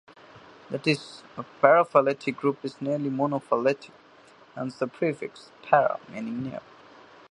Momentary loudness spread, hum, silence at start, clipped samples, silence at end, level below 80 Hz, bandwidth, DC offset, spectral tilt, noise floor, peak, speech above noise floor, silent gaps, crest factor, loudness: 20 LU; none; 0.35 s; under 0.1%; 0.7 s; -74 dBFS; 10.5 kHz; under 0.1%; -6.5 dB/octave; -54 dBFS; -2 dBFS; 28 dB; none; 26 dB; -26 LUFS